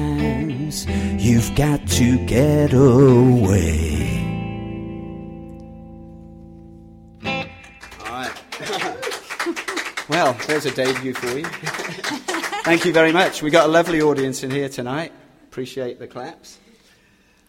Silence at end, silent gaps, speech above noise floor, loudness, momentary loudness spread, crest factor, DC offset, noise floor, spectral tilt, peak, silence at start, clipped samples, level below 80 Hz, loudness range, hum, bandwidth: 0.95 s; none; 39 dB; -19 LUFS; 19 LU; 20 dB; under 0.1%; -56 dBFS; -5.5 dB/octave; 0 dBFS; 0 s; under 0.1%; -36 dBFS; 16 LU; none; 16.5 kHz